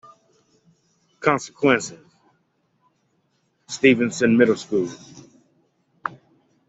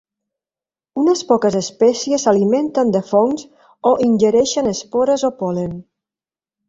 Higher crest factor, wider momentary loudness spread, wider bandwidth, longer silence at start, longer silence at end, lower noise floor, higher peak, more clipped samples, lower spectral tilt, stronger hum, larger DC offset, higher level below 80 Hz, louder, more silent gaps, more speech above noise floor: first, 22 dB vs 16 dB; first, 16 LU vs 8 LU; about the same, 8.2 kHz vs 7.8 kHz; first, 1.2 s vs 0.95 s; second, 0.6 s vs 0.85 s; second, -68 dBFS vs under -90 dBFS; about the same, -2 dBFS vs -2 dBFS; neither; about the same, -5 dB/octave vs -5 dB/octave; neither; neither; second, -64 dBFS vs -56 dBFS; second, -20 LUFS vs -16 LUFS; neither; second, 49 dB vs over 74 dB